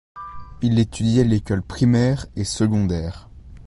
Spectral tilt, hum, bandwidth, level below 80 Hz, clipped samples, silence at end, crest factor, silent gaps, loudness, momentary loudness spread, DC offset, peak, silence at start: -6.5 dB/octave; none; 11.5 kHz; -38 dBFS; under 0.1%; 0 s; 16 dB; none; -20 LUFS; 19 LU; under 0.1%; -4 dBFS; 0.15 s